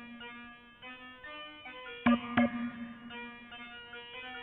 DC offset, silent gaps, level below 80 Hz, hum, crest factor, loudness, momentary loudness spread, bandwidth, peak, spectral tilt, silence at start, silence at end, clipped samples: under 0.1%; none; -66 dBFS; none; 24 dB; -36 LUFS; 18 LU; 4.1 kHz; -12 dBFS; -3 dB/octave; 0 s; 0 s; under 0.1%